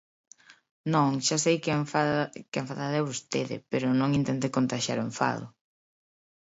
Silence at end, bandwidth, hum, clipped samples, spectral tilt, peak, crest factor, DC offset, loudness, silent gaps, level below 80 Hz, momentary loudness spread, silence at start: 1.1 s; 8 kHz; none; under 0.1%; -5 dB/octave; -10 dBFS; 18 dB; under 0.1%; -28 LUFS; 0.71-0.84 s; -66 dBFS; 8 LU; 0.5 s